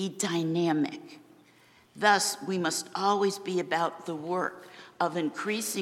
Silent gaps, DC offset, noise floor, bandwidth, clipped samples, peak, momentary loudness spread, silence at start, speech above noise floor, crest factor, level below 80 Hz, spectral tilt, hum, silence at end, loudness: none; under 0.1%; -60 dBFS; 16.5 kHz; under 0.1%; -10 dBFS; 9 LU; 0 s; 31 dB; 20 dB; -80 dBFS; -3.5 dB/octave; none; 0 s; -29 LUFS